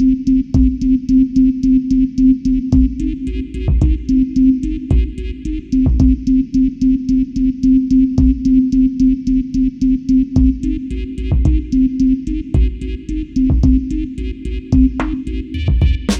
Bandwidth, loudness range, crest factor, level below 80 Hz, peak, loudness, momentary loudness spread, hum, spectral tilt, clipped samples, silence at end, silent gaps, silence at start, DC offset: 7.8 kHz; 3 LU; 12 dB; -20 dBFS; -2 dBFS; -15 LUFS; 10 LU; none; -8.5 dB/octave; under 0.1%; 0 s; none; 0 s; under 0.1%